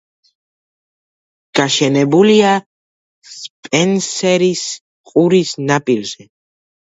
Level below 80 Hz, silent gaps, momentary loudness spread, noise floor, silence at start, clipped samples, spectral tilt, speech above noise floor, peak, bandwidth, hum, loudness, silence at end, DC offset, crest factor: -62 dBFS; 2.66-3.22 s, 3.50-3.63 s, 4.81-5.04 s; 18 LU; under -90 dBFS; 1.55 s; under 0.1%; -4.5 dB/octave; over 76 dB; 0 dBFS; 8 kHz; none; -14 LUFS; 0.8 s; under 0.1%; 16 dB